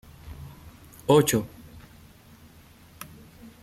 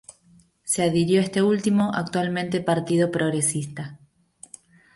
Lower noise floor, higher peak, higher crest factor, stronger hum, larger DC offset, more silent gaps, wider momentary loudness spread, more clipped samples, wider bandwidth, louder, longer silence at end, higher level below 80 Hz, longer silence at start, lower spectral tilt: second, -52 dBFS vs -57 dBFS; about the same, -6 dBFS vs -8 dBFS; first, 22 dB vs 16 dB; neither; neither; neither; first, 28 LU vs 18 LU; neither; first, 16 kHz vs 11.5 kHz; about the same, -23 LUFS vs -23 LUFS; second, 0.6 s vs 1 s; first, -54 dBFS vs -62 dBFS; first, 0.25 s vs 0.1 s; about the same, -5 dB/octave vs -5 dB/octave